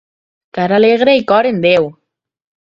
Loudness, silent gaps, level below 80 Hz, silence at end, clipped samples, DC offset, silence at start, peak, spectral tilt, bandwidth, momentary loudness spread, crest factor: -12 LUFS; none; -56 dBFS; 0.7 s; under 0.1%; under 0.1%; 0.55 s; 0 dBFS; -7 dB/octave; 7.2 kHz; 11 LU; 14 dB